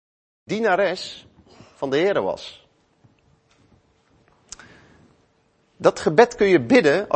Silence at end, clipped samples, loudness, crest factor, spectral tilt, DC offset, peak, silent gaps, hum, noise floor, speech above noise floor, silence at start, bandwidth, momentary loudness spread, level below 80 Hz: 0 s; under 0.1%; -19 LUFS; 22 dB; -5 dB/octave; under 0.1%; 0 dBFS; none; none; -63 dBFS; 44 dB; 0.5 s; 8.8 kHz; 26 LU; -58 dBFS